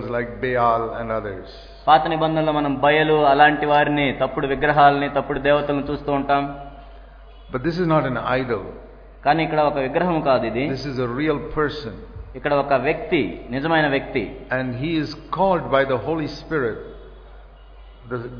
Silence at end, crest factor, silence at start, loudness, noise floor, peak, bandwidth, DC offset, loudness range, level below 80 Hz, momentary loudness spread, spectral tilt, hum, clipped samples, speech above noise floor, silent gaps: 0 s; 20 dB; 0 s; -20 LUFS; -43 dBFS; 0 dBFS; 5.4 kHz; under 0.1%; 6 LU; -42 dBFS; 14 LU; -7.5 dB/octave; none; under 0.1%; 23 dB; none